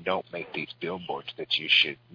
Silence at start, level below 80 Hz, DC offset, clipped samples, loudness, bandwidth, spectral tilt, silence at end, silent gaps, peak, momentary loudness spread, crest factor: 0 s; -72 dBFS; under 0.1%; under 0.1%; -27 LUFS; 5.4 kHz; -4 dB/octave; 0.2 s; none; -8 dBFS; 14 LU; 22 dB